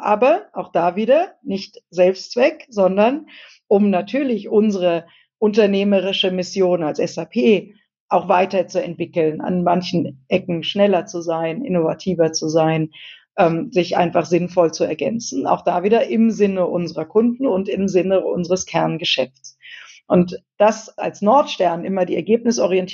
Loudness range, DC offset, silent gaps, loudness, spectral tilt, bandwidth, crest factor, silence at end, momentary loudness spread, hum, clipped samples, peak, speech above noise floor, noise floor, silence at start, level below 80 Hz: 2 LU; under 0.1%; 8.00-8.08 s; -18 LUFS; -5.5 dB/octave; 7.6 kHz; 16 dB; 0 s; 8 LU; none; under 0.1%; -2 dBFS; 23 dB; -41 dBFS; 0 s; -60 dBFS